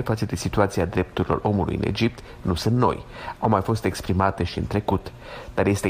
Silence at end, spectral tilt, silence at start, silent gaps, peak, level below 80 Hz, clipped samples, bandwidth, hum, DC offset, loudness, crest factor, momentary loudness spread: 0 s; -6.5 dB/octave; 0 s; none; -4 dBFS; -40 dBFS; under 0.1%; 15.5 kHz; none; under 0.1%; -24 LUFS; 18 dB; 8 LU